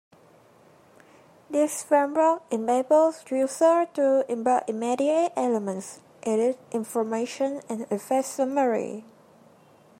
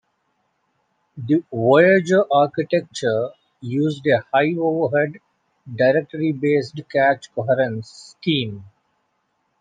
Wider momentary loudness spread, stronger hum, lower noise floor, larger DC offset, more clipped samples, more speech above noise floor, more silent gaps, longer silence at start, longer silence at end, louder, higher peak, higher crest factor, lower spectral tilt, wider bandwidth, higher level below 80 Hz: second, 10 LU vs 14 LU; neither; second, -56 dBFS vs -70 dBFS; neither; neither; second, 32 dB vs 51 dB; neither; first, 1.5 s vs 1.15 s; about the same, 0.95 s vs 0.95 s; second, -25 LUFS vs -19 LUFS; second, -8 dBFS vs -2 dBFS; about the same, 18 dB vs 18 dB; second, -4.5 dB/octave vs -6.5 dB/octave; first, 16 kHz vs 9.4 kHz; second, -80 dBFS vs -68 dBFS